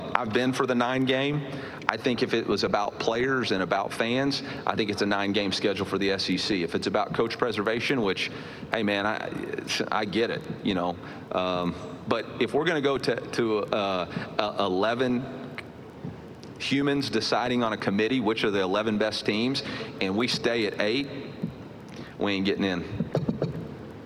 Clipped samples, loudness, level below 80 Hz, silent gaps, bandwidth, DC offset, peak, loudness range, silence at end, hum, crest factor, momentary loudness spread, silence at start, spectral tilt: under 0.1%; -27 LUFS; -58 dBFS; none; 15 kHz; under 0.1%; -2 dBFS; 3 LU; 0 s; none; 26 dB; 11 LU; 0 s; -5 dB/octave